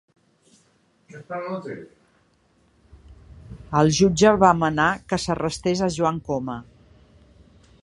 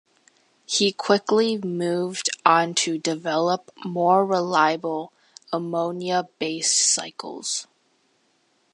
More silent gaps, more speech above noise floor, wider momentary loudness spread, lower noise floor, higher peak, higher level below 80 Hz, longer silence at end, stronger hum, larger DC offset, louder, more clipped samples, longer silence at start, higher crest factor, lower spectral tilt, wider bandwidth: neither; about the same, 41 dB vs 43 dB; first, 20 LU vs 11 LU; second, -62 dBFS vs -66 dBFS; about the same, -2 dBFS vs -2 dBFS; first, -48 dBFS vs -78 dBFS; about the same, 1.2 s vs 1.1 s; neither; neither; about the same, -21 LUFS vs -22 LUFS; neither; first, 1.15 s vs 0.7 s; about the same, 22 dB vs 22 dB; first, -5 dB/octave vs -3 dB/octave; about the same, 11.5 kHz vs 11.5 kHz